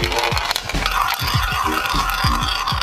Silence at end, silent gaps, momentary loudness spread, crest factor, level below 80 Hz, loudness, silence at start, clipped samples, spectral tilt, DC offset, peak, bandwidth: 0 s; none; 2 LU; 18 dB; -28 dBFS; -19 LUFS; 0 s; under 0.1%; -3 dB/octave; under 0.1%; 0 dBFS; 16 kHz